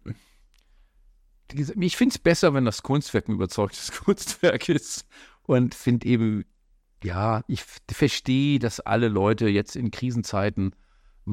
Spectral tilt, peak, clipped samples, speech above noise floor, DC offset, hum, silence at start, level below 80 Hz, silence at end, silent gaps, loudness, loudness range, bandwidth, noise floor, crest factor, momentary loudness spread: -5.5 dB/octave; -6 dBFS; under 0.1%; 38 dB; under 0.1%; none; 0.05 s; -50 dBFS; 0 s; none; -24 LUFS; 2 LU; 16 kHz; -62 dBFS; 18 dB; 12 LU